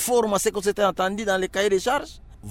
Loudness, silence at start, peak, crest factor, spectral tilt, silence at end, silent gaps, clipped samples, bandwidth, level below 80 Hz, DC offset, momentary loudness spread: -23 LUFS; 0 s; -8 dBFS; 16 dB; -3 dB/octave; 0 s; none; under 0.1%; 16.5 kHz; -48 dBFS; under 0.1%; 6 LU